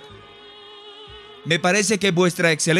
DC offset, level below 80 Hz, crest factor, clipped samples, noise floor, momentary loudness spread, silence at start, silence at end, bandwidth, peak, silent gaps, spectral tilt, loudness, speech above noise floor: under 0.1%; -60 dBFS; 16 dB; under 0.1%; -44 dBFS; 23 LU; 0 s; 0 s; 15.5 kHz; -6 dBFS; none; -3.5 dB/octave; -19 LUFS; 25 dB